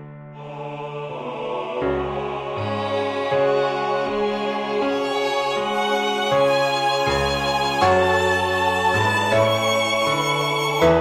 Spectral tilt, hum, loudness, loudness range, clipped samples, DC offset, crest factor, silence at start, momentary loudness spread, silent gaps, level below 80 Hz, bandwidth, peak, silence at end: -4.5 dB/octave; none; -21 LUFS; 5 LU; under 0.1%; under 0.1%; 16 dB; 0 s; 11 LU; none; -46 dBFS; 15 kHz; -4 dBFS; 0 s